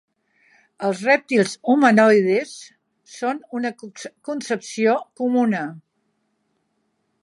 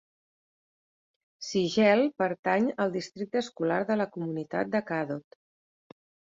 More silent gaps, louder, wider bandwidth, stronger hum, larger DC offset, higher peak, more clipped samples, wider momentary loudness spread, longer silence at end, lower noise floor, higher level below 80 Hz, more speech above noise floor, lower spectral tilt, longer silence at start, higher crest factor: second, none vs 2.39-2.43 s; first, -20 LUFS vs -28 LUFS; first, 11.5 kHz vs 7.8 kHz; neither; neither; first, -2 dBFS vs -10 dBFS; neither; first, 19 LU vs 12 LU; first, 1.45 s vs 1.15 s; second, -71 dBFS vs under -90 dBFS; about the same, -76 dBFS vs -72 dBFS; second, 51 dB vs over 62 dB; about the same, -5 dB/octave vs -5.5 dB/octave; second, 0.8 s vs 1.4 s; about the same, 18 dB vs 20 dB